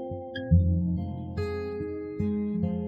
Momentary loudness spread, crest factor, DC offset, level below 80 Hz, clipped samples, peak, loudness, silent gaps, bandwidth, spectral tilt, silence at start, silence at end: 11 LU; 18 dB; under 0.1%; -40 dBFS; under 0.1%; -10 dBFS; -29 LUFS; none; 5.2 kHz; -10 dB/octave; 0 s; 0 s